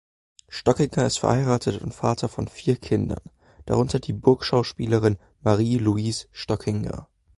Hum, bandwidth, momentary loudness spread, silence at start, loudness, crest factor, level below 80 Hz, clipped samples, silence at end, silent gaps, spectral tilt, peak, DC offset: none; 11.5 kHz; 8 LU; 0.5 s; -24 LUFS; 20 dB; -46 dBFS; under 0.1%; 0.35 s; none; -6.5 dB/octave; -4 dBFS; under 0.1%